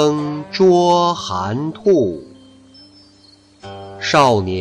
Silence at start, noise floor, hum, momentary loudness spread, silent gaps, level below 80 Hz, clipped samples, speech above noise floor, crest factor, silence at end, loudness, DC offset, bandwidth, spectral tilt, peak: 0 s; -49 dBFS; none; 20 LU; none; -54 dBFS; under 0.1%; 34 dB; 14 dB; 0 s; -16 LUFS; under 0.1%; 10.5 kHz; -5.5 dB/octave; -4 dBFS